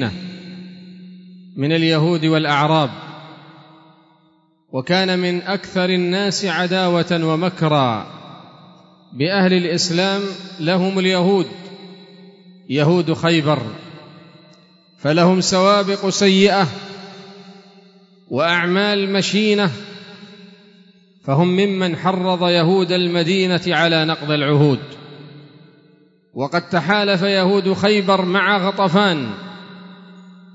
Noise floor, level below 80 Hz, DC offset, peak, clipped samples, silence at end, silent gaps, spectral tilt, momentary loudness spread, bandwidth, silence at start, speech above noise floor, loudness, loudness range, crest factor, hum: -57 dBFS; -64 dBFS; under 0.1%; -2 dBFS; under 0.1%; 0.25 s; none; -5.5 dB/octave; 21 LU; 8 kHz; 0 s; 41 dB; -17 LUFS; 4 LU; 16 dB; none